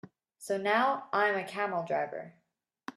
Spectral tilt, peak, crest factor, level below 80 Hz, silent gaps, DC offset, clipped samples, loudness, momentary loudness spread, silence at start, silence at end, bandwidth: -4.5 dB/octave; -12 dBFS; 20 dB; -84 dBFS; none; under 0.1%; under 0.1%; -31 LUFS; 20 LU; 0.05 s; 0.05 s; 14 kHz